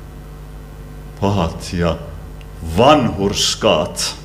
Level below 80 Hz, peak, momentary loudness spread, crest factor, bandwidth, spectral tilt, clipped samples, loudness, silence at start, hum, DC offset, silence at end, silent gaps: -34 dBFS; 0 dBFS; 24 LU; 18 dB; 16 kHz; -4.5 dB/octave; under 0.1%; -16 LUFS; 0 s; none; under 0.1%; 0 s; none